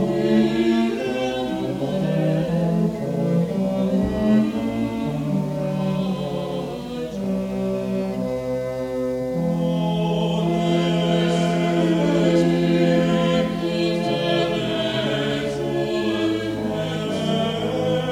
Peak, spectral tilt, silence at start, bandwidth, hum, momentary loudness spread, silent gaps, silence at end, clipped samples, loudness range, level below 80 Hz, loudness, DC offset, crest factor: -6 dBFS; -7 dB/octave; 0 s; 13.5 kHz; none; 7 LU; none; 0 s; under 0.1%; 6 LU; -46 dBFS; -22 LUFS; under 0.1%; 16 dB